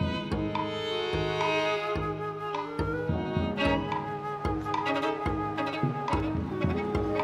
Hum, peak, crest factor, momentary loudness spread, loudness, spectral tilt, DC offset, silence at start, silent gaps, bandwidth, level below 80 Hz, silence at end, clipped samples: none; -12 dBFS; 16 dB; 5 LU; -30 LUFS; -6.5 dB/octave; under 0.1%; 0 s; none; 13 kHz; -44 dBFS; 0 s; under 0.1%